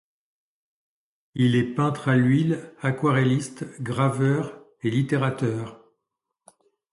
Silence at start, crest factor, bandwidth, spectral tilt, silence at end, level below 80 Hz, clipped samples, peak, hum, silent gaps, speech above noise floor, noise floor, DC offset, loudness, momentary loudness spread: 1.35 s; 18 dB; 11.5 kHz; -7 dB/octave; 1.15 s; -62 dBFS; under 0.1%; -8 dBFS; none; none; 60 dB; -83 dBFS; under 0.1%; -24 LUFS; 13 LU